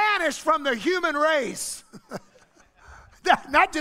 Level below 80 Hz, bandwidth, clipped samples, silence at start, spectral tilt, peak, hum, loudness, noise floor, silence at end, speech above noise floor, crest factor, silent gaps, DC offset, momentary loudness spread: -56 dBFS; 16 kHz; under 0.1%; 0 s; -2 dB/octave; -2 dBFS; none; -23 LUFS; -57 dBFS; 0 s; 33 dB; 22 dB; none; under 0.1%; 20 LU